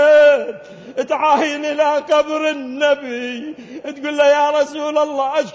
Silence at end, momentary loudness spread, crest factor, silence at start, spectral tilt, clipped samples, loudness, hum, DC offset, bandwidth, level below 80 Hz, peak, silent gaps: 0 s; 16 LU; 12 dB; 0 s; -3 dB/octave; under 0.1%; -16 LUFS; none; under 0.1%; 8 kHz; -64 dBFS; -4 dBFS; none